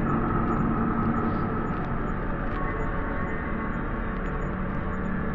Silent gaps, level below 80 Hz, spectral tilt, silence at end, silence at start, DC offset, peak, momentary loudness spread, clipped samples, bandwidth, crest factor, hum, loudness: none; -34 dBFS; -9.5 dB/octave; 0 s; 0 s; under 0.1%; -14 dBFS; 5 LU; under 0.1%; 7.2 kHz; 12 dB; none; -29 LUFS